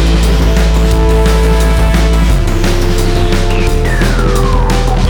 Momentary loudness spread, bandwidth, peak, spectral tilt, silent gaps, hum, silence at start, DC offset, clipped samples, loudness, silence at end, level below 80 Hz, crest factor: 3 LU; 18 kHz; 0 dBFS; -5.5 dB/octave; none; none; 0 s; under 0.1%; under 0.1%; -12 LUFS; 0 s; -10 dBFS; 8 dB